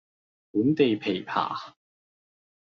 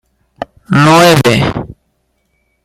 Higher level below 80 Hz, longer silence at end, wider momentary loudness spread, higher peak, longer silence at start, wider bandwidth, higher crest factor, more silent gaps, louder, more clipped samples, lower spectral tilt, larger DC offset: second, -72 dBFS vs -38 dBFS; about the same, 0.95 s vs 0.9 s; second, 13 LU vs 22 LU; second, -8 dBFS vs 0 dBFS; first, 0.55 s vs 0.4 s; second, 6.8 kHz vs 16 kHz; first, 20 dB vs 12 dB; neither; second, -26 LUFS vs -8 LUFS; neither; about the same, -4.5 dB/octave vs -5 dB/octave; neither